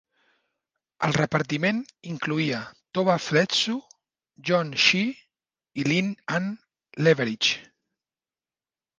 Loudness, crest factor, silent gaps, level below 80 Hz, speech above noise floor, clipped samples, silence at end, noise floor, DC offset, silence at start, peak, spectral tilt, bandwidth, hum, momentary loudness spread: -24 LUFS; 22 dB; none; -66 dBFS; over 66 dB; under 0.1%; 1.35 s; under -90 dBFS; under 0.1%; 1 s; -6 dBFS; -4.5 dB/octave; 10 kHz; none; 14 LU